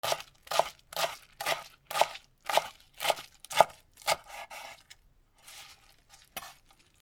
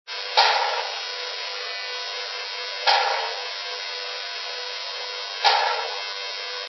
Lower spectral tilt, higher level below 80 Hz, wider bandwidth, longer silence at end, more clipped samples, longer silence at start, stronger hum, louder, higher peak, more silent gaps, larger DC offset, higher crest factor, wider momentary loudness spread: first, -0.5 dB/octave vs 6 dB/octave; first, -66 dBFS vs under -90 dBFS; first, over 20 kHz vs 6.2 kHz; first, 0.5 s vs 0 s; neither; about the same, 0.05 s vs 0.05 s; neither; second, -32 LUFS vs -24 LUFS; about the same, -2 dBFS vs -2 dBFS; neither; neither; first, 32 dB vs 24 dB; first, 21 LU vs 10 LU